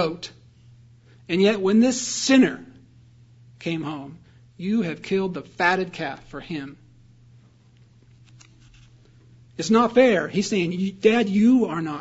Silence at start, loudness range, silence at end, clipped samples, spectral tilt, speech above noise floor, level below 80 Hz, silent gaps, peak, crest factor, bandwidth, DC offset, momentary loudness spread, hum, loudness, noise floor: 0 s; 12 LU; 0 s; under 0.1%; -5 dB/octave; 33 dB; -60 dBFS; none; -4 dBFS; 20 dB; 8 kHz; under 0.1%; 17 LU; none; -22 LUFS; -54 dBFS